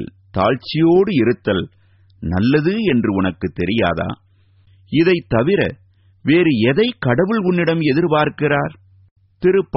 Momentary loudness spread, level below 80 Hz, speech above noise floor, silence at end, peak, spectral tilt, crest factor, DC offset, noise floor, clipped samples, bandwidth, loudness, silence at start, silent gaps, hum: 9 LU; -46 dBFS; 37 dB; 0 s; 0 dBFS; -5.5 dB/octave; 16 dB; under 0.1%; -53 dBFS; under 0.1%; 5.8 kHz; -17 LUFS; 0 s; 9.11-9.16 s; none